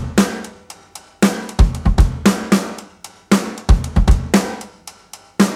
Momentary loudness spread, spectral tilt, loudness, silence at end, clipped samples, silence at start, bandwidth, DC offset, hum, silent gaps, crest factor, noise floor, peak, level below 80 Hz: 21 LU; -5.5 dB/octave; -17 LUFS; 0 s; under 0.1%; 0 s; 15.5 kHz; under 0.1%; none; none; 16 dB; -42 dBFS; 0 dBFS; -20 dBFS